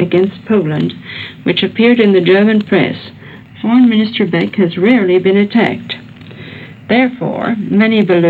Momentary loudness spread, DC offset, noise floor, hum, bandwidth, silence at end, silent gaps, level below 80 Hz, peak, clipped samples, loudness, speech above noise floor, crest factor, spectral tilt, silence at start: 16 LU; under 0.1%; -32 dBFS; none; 4.7 kHz; 0 s; none; -56 dBFS; 0 dBFS; under 0.1%; -12 LUFS; 21 dB; 12 dB; -8.5 dB/octave; 0 s